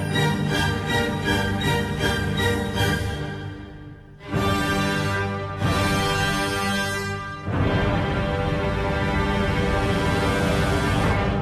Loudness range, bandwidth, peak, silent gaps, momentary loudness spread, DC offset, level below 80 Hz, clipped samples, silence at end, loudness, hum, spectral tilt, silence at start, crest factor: 2 LU; 14.5 kHz; -8 dBFS; none; 8 LU; under 0.1%; -34 dBFS; under 0.1%; 0 s; -23 LUFS; none; -5.5 dB/octave; 0 s; 14 dB